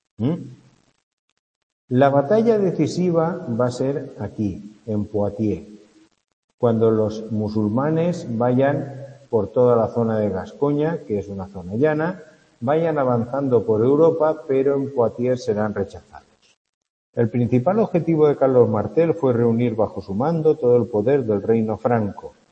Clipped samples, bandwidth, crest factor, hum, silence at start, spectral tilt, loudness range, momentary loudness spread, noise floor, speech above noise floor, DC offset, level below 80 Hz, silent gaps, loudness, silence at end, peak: under 0.1%; 8.6 kHz; 18 dB; none; 0.2 s; -8.5 dB/octave; 5 LU; 10 LU; -50 dBFS; 31 dB; under 0.1%; -58 dBFS; 1.03-1.88 s, 6.33-6.48 s, 6.54-6.58 s, 16.57-16.81 s, 16.90-17.13 s; -20 LUFS; 0.2 s; -2 dBFS